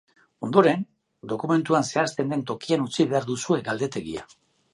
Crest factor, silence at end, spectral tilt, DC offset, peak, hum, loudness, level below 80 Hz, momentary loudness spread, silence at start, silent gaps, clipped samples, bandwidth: 22 dB; 0.5 s; -5.5 dB/octave; under 0.1%; -2 dBFS; none; -24 LUFS; -64 dBFS; 16 LU; 0.4 s; none; under 0.1%; 11.5 kHz